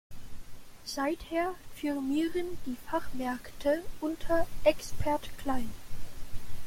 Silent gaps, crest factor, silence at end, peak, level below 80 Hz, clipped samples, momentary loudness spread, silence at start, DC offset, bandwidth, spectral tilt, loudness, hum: none; 20 dB; 0 s; -10 dBFS; -44 dBFS; under 0.1%; 19 LU; 0.1 s; under 0.1%; 16.5 kHz; -5 dB/octave; -33 LUFS; none